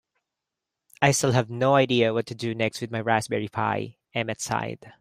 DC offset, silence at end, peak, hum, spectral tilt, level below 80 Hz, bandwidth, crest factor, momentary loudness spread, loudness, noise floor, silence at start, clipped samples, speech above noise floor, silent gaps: under 0.1%; 0.1 s; -2 dBFS; none; -4.5 dB/octave; -62 dBFS; 15.5 kHz; 22 dB; 10 LU; -25 LUFS; -86 dBFS; 1 s; under 0.1%; 61 dB; none